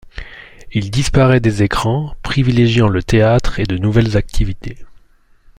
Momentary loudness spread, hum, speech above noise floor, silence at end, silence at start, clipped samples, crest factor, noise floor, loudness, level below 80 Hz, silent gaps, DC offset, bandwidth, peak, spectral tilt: 14 LU; none; 35 dB; 0.65 s; 0.05 s; under 0.1%; 14 dB; -49 dBFS; -15 LUFS; -26 dBFS; none; under 0.1%; 11.5 kHz; 0 dBFS; -6.5 dB/octave